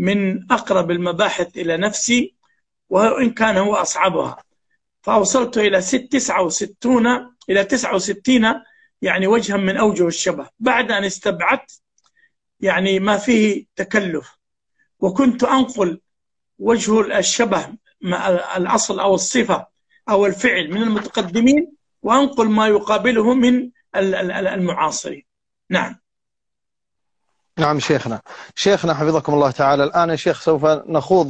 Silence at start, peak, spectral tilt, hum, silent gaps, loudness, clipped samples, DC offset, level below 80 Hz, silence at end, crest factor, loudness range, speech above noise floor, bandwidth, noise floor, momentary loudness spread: 0 s; -2 dBFS; -4 dB/octave; none; none; -18 LUFS; under 0.1%; under 0.1%; -54 dBFS; 0 s; 16 dB; 4 LU; 68 dB; 9 kHz; -85 dBFS; 8 LU